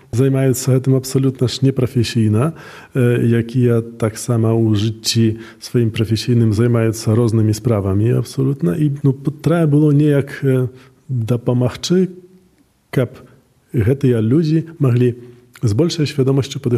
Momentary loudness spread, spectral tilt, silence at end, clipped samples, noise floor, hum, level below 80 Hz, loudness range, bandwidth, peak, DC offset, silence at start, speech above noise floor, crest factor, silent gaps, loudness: 7 LU; -7 dB/octave; 0 s; under 0.1%; -55 dBFS; none; -52 dBFS; 3 LU; 14.5 kHz; -2 dBFS; under 0.1%; 0.15 s; 40 dB; 14 dB; none; -16 LUFS